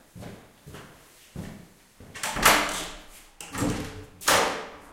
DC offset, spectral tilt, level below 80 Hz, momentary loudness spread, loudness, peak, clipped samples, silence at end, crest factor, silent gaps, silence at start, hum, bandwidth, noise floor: under 0.1%; -2 dB/octave; -48 dBFS; 25 LU; -24 LUFS; -4 dBFS; under 0.1%; 0 s; 26 dB; none; 0.15 s; none; 16.5 kHz; -52 dBFS